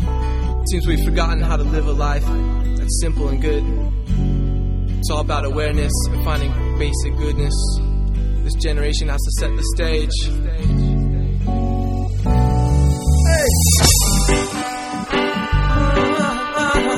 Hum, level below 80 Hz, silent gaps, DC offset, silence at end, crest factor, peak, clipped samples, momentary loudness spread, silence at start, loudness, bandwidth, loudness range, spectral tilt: none; -18 dBFS; none; under 0.1%; 0 s; 16 dB; 0 dBFS; under 0.1%; 7 LU; 0 s; -19 LUFS; 15.5 kHz; 5 LU; -4.5 dB/octave